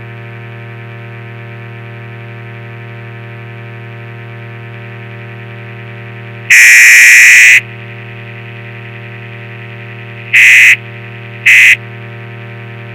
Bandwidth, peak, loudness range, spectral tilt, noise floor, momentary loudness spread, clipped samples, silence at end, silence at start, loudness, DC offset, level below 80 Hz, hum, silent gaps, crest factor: over 20 kHz; 0 dBFS; 23 LU; -1 dB/octave; -26 dBFS; 28 LU; 3%; 0 s; 0 s; -2 LUFS; under 0.1%; -56 dBFS; none; none; 10 dB